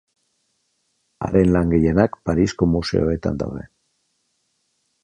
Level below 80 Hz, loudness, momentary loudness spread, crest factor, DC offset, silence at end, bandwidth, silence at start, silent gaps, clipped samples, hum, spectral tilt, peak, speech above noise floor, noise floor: -36 dBFS; -20 LUFS; 11 LU; 20 dB; under 0.1%; 1.4 s; 9.8 kHz; 1.2 s; none; under 0.1%; none; -7.5 dB/octave; -2 dBFS; 51 dB; -70 dBFS